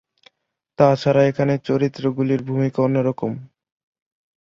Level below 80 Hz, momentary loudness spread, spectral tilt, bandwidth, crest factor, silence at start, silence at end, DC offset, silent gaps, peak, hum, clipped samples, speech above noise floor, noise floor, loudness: -58 dBFS; 7 LU; -8 dB/octave; 7.2 kHz; 18 dB; 0.8 s; 0.95 s; under 0.1%; none; -2 dBFS; none; under 0.1%; 54 dB; -73 dBFS; -19 LUFS